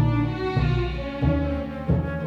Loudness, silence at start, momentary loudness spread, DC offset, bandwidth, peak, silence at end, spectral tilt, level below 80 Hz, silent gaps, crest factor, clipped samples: -25 LUFS; 0 s; 5 LU; under 0.1%; 6.4 kHz; -8 dBFS; 0 s; -9 dB/octave; -32 dBFS; none; 14 dB; under 0.1%